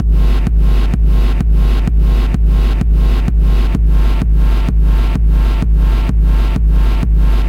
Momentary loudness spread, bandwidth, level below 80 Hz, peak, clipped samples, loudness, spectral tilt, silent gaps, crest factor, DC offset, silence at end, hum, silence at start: 1 LU; 5.2 kHz; -10 dBFS; -2 dBFS; under 0.1%; -14 LUFS; -8 dB/octave; none; 8 dB; under 0.1%; 0 s; none; 0 s